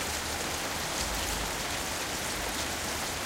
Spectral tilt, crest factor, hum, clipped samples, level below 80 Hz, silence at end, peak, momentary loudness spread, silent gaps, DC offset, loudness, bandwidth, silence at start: -2 dB/octave; 14 dB; none; under 0.1%; -44 dBFS; 0 s; -18 dBFS; 1 LU; none; under 0.1%; -31 LUFS; 16.5 kHz; 0 s